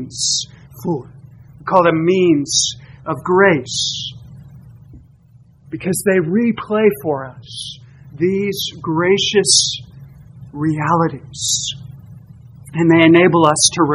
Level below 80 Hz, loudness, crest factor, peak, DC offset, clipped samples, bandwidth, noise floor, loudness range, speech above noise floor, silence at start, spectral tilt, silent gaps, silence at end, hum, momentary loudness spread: -50 dBFS; -15 LUFS; 18 dB; 0 dBFS; under 0.1%; under 0.1%; 14.5 kHz; -47 dBFS; 4 LU; 32 dB; 0 s; -3.5 dB/octave; none; 0 s; none; 17 LU